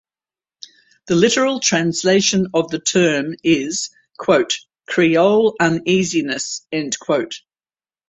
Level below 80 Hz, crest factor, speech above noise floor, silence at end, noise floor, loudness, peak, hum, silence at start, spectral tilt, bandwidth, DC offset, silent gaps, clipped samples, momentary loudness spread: -58 dBFS; 16 dB; over 73 dB; 0.7 s; under -90 dBFS; -17 LUFS; -2 dBFS; none; 1.05 s; -4 dB/octave; 8.4 kHz; under 0.1%; none; under 0.1%; 9 LU